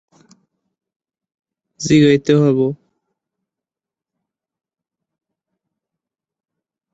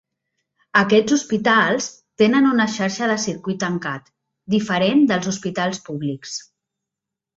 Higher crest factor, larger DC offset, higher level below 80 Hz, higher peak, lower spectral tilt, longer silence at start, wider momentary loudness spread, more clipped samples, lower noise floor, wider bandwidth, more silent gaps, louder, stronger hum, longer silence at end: about the same, 20 dB vs 18 dB; neither; about the same, -56 dBFS vs -60 dBFS; about the same, -2 dBFS vs -2 dBFS; first, -6.5 dB/octave vs -4.5 dB/octave; first, 1.8 s vs 0.75 s; about the same, 14 LU vs 12 LU; neither; about the same, -88 dBFS vs -85 dBFS; about the same, 8 kHz vs 8 kHz; neither; first, -14 LUFS vs -19 LUFS; neither; first, 4.2 s vs 0.95 s